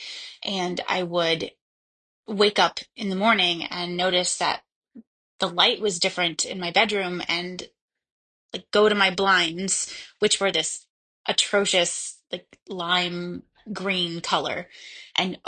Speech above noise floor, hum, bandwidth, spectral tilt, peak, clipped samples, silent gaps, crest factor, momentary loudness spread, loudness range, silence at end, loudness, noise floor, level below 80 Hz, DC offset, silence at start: over 66 dB; none; 9.8 kHz; -2.5 dB/octave; -4 dBFS; under 0.1%; 1.61-2.23 s, 4.76-4.82 s, 5.07-5.39 s, 7.81-7.88 s, 8.11-8.49 s, 10.90-11.24 s, 12.62-12.66 s; 22 dB; 16 LU; 3 LU; 0.1 s; -23 LUFS; under -90 dBFS; -66 dBFS; under 0.1%; 0 s